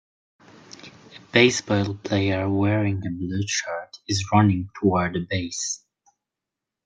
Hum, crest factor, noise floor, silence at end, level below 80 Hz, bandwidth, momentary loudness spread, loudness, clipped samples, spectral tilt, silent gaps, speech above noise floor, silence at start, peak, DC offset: none; 22 dB; -86 dBFS; 1.1 s; -60 dBFS; 9.4 kHz; 15 LU; -23 LUFS; under 0.1%; -5 dB/octave; none; 64 dB; 0.85 s; -2 dBFS; under 0.1%